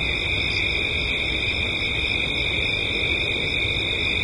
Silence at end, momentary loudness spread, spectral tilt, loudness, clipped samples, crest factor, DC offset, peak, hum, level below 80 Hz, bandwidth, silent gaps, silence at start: 0 s; 1 LU; -4 dB/octave; -21 LUFS; under 0.1%; 14 dB; under 0.1%; -10 dBFS; none; -36 dBFS; 11.5 kHz; none; 0 s